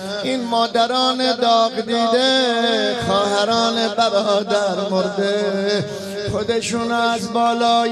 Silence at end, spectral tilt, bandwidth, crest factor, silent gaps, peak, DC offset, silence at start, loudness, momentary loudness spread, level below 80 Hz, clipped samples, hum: 0 s; -4 dB/octave; 13 kHz; 14 dB; none; -4 dBFS; under 0.1%; 0 s; -18 LUFS; 5 LU; -54 dBFS; under 0.1%; none